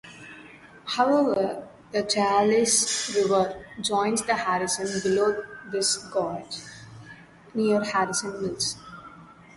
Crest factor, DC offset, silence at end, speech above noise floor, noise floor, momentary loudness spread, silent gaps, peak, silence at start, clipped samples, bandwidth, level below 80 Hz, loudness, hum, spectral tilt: 18 dB; under 0.1%; 0.25 s; 24 dB; -48 dBFS; 22 LU; none; -8 dBFS; 0.05 s; under 0.1%; 11.5 kHz; -62 dBFS; -25 LUFS; none; -3 dB/octave